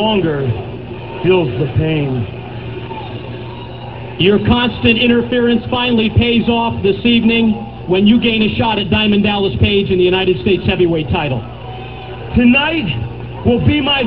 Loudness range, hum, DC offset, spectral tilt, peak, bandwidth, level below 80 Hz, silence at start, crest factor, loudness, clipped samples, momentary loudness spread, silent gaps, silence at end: 6 LU; 60 Hz at -30 dBFS; 0.7%; -9.5 dB/octave; 0 dBFS; 5.2 kHz; -32 dBFS; 0 s; 14 dB; -14 LUFS; under 0.1%; 16 LU; none; 0 s